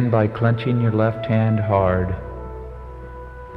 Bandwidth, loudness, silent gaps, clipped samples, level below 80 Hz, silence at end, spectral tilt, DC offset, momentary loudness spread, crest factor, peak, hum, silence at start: 4.7 kHz; -20 LUFS; none; under 0.1%; -38 dBFS; 0 s; -10.5 dB/octave; under 0.1%; 18 LU; 16 dB; -4 dBFS; none; 0 s